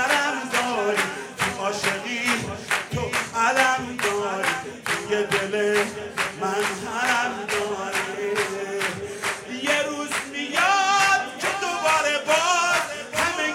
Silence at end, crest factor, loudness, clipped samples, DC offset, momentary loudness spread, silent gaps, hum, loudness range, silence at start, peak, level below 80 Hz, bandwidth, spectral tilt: 0 s; 20 dB; -23 LUFS; under 0.1%; under 0.1%; 8 LU; none; none; 4 LU; 0 s; -4 dBFS; -60 dBFS; 16.5 kHz; -2 dB/octave